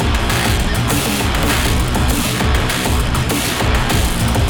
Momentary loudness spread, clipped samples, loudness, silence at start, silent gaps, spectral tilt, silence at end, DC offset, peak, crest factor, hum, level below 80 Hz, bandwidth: 1 LU; under 0.1%; -16 LUFS; 0 s; none; -4 dB/octave; 0 s; under 0.1%; -2 dBFS; 14 dB; none; -20 dBFS; over 20 kHz